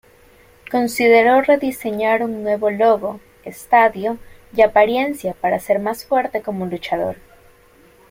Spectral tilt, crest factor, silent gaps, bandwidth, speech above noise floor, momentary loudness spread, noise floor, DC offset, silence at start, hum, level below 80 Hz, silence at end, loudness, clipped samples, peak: -5 dB/octave; 18 dB; none; 16.5 kHz; 33 dB; 13 LU; -50 dBFS; under 0.1%; 0.7 s; none; -52 dBFS; 0.95 s; -17 LUFS; under 0.1%; 0 dBFS